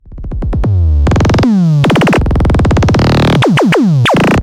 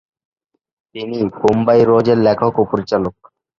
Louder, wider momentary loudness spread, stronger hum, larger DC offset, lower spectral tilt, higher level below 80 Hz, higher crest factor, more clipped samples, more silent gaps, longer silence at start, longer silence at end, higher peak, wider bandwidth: first, -10 LUFS vs -15 LUFS; second, 5 LU vs 14 LU; neither; neither; about the same, -7 dB/octave vs -8 dB/octave; first, -18 dBFS vs -50 dBFS; second, 6 dB vs 16 dB; neither; neither; second, 0.05 s vs 0.95 s; second, 0 s vs 0.5 s; about the same, -2 dBFS vs 0 dBFS; first, 15 kHz vs 7.2 kHz